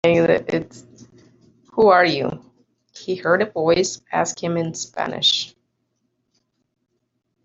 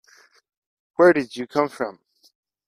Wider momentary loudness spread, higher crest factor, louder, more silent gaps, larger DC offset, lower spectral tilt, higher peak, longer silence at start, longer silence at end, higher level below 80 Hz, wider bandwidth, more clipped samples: about the same, 14 LU vs 14 LU; about the same, 18 dB vs 20 dB; about the same, -19 LUFS vs -21 LUFS; neither; neither; second, -4 dB/octave vs -6 dB/octave; about the same, -4 dBFS vs -4 dBFS; second, 0.05 s vs 1 s; first, 2 s vs 0.75 s; first, -58 dBFS vs -68 dBFS; second, 8 kHz vs 11.5 kHz; neither